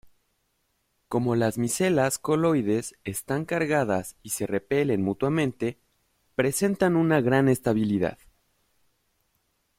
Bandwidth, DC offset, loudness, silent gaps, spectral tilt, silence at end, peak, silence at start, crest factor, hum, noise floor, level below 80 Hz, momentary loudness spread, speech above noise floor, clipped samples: 16.5 kHz; under 0.1%; -25 LUFS; none; -5.5 dB/octave; 1.65 s; -6 dBFS; 1.1 s; 20 dB; none; -73 dBFS; -58 dBFS; 9 LU; 49 dB; under 0.1%